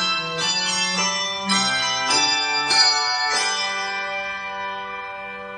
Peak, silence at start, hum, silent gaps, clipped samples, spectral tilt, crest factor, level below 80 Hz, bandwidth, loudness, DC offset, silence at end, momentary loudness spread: -6 dBFS; 0 s; none; none; under 0.1%; -0.5 dB/octave; 18 dB; -60 dBFS; 10.5 kHz; -19 LUFS; under 0.1%; 0 s; 13 LU